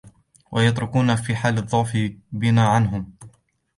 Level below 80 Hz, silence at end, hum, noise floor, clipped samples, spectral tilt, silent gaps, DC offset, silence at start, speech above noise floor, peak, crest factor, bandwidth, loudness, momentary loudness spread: -48 dBFS; 0.5 s; none; -52 dBFS; under 0.1%; -6.5 dB/octave; none; under 0.1%; 0.05 s; 33 dB; -6 dBFS; 16 dB; 11.5 kHz; -21 LUFS; 10 LU